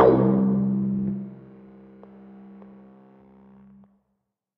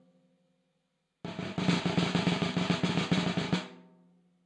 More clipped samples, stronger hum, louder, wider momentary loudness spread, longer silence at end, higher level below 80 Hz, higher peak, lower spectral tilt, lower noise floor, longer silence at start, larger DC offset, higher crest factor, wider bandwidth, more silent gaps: neither; neither; first, -23 LUFS vs -30 LUFS; first, 27 LU vs 12 LU; first, 2.05 s vs 0.65 s; first, -54 dBFS vs -64 dBFS; first, -4 dBFS vs -14 dBFS; first, -12.5 dB/octave vs -5.5 dB/octave; about the same, -78 dBFS vs -79 dBFS; second, 0 s vs 1.25 s; neither; about the same, 20 dB vs 18 dB; second, 4.2 kHz vs 10 kHz; neither